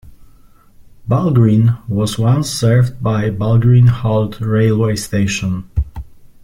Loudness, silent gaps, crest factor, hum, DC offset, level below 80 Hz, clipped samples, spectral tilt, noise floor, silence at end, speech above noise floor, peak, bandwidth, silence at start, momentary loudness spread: -15 LUFS; none; 14 dB; none; under 0.1%; -34 dBFS; under 0.1%; -7 dB/octave; -44 dBFS; 0.2 s; 31 dB; -2 dBFS; 14.5 kHz; 0.05 s; 10 LU